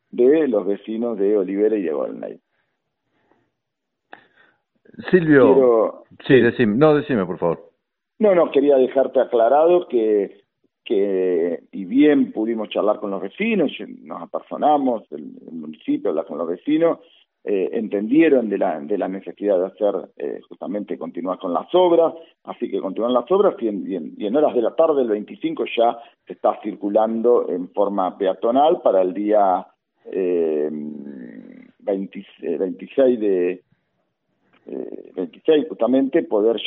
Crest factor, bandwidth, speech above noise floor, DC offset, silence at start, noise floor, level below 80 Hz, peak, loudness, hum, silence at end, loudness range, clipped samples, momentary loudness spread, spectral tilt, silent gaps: 20 dB; 4.3 kHz; 61 dB; under 0.1%; 0.15 s; -80 dBFS; -64 dBFS; 0 dBFS; -19 LUFS; none; 0 s; 7 LU; under 0.1%; 16 LU; -5.5 dB/octave; none